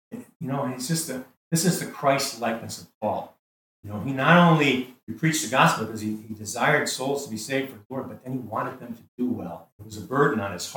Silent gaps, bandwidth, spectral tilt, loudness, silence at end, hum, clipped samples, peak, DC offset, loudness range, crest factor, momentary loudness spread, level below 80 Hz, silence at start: 0.35-0.40 s, 1.37-1.51 s, 2.94-3.01 s, 3.39-3.83 s, 5.03-5.07 s, 7.85-7.90 s, 9.08-9.18 s, 9.72-9.79 s; 20 kHz; -4.5 dB/octave; -25 LUFS; 0 s; none; under 0.1%; -4 dBFS; under 0.1%; 7 LU; 22 dB; 17 LU; -72 dBFS; 0.1 s